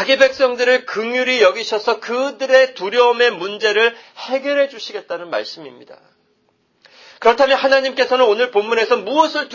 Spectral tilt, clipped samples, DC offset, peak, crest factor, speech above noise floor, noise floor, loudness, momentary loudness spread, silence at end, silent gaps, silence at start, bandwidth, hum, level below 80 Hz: -2 dB/octave; under 0.1%; under 0.1%; 0 dBFS; 16 dB; 46 dB; -62 dBFS; -16 LUFS; 11 LU; 0 s; none; 0 s; 7.4 kHz; none; -62 dBFS